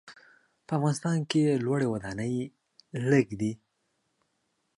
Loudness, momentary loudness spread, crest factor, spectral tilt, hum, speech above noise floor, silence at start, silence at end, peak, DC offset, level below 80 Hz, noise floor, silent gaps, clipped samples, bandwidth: -28 LUFS; 9 LU; 20 dB; -6.5 dB/octave; none; 49 dB; 0.05 s; 1.25 s; -10 dBFS; under 0.1%; -64 dBFS; -77 dBFS; none; under 0.1%; 11.5 kHz